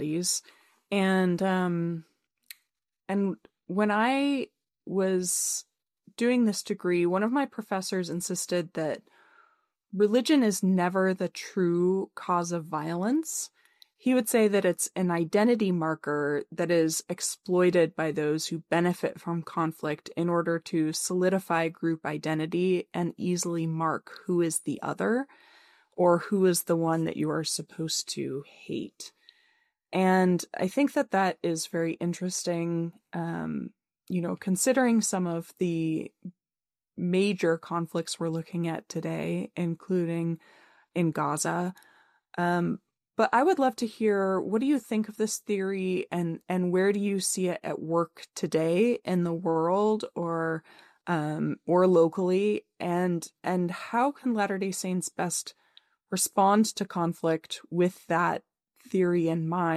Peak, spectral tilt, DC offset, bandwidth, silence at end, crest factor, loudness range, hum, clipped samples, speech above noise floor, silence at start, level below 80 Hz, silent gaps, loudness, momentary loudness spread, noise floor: -10 dBFS; -5 dB/octave; under 0.1%; 15 kHz; 0 s; 18 dB; 4 LU; none; under 0.1%; over 63 dB; 0 s; -74 dBFS; none; -28 LUFS; 10 LU; under -90 dBFS